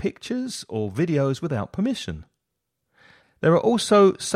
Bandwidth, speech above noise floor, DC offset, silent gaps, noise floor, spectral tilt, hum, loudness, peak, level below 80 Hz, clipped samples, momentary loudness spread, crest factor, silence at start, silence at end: 15 kHz; 58 dB; under 0.1%; none; -80 dBFS; -5.5 dB/octave; none; -22 LUFS; -6 dBFS; -54 dBFS; under 0.1%; 13 LU; 16 dB; 0 s; 0 s